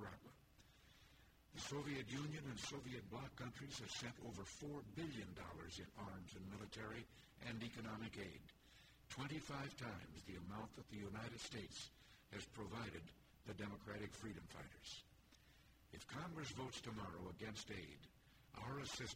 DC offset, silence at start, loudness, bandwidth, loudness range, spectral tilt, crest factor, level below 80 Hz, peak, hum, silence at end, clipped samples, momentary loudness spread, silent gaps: under 0.1%; 0 s; -52 LUFS; 16 kHz; 3 LU; -4.5 dB/octave; 18 dB; -70 dBFS; -36 dBFS; none; 0 s; under 0.1%; 15 LU; none